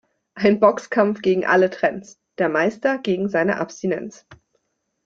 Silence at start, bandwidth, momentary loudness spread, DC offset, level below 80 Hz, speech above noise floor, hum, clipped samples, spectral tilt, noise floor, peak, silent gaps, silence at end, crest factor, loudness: 0.35 s; 7.6 kHz; 9 LU; under 0.1%; -62 dBFS; 51 dB; none; under 0.1%; -6 dB/octave; -71 dBFS; -2 dBFS; none; 0.7 s; 18 dB; -20 LUFS